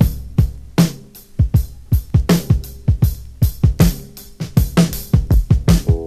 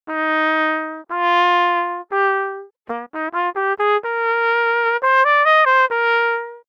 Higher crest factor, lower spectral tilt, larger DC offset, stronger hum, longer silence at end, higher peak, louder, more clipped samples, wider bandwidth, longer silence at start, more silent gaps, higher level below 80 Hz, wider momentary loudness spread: about the same, 16 dB vs 14 dB; first, -6.5 dB/octave vs -2.5 dB/octave; neither; neither; about the same, 0 s vs 0.1 s; first, 0 dBFS vs -4 dBFS; about the same, -17 LUFS vs -17 LUFS; neither; first, 14.5 kHz vs 7.4 kHz; about the same, 0 s vs 0.05 s; neither; first, -22 dBFS vs -78 dBFS; second, 6 LU vs 13 LU